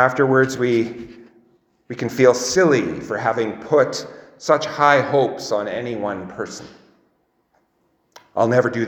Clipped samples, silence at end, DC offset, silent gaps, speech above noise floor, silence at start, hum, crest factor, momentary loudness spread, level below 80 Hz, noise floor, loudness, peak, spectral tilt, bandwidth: under 0.1%; 0 s; under 0.1%; none; 47 dB; 0 s; none; 20 dB; 15 LU; -60 dBFS; -65 dBFS; -19 LUFS; 0 dBFS; -5 dB/octave; 19.5 kHz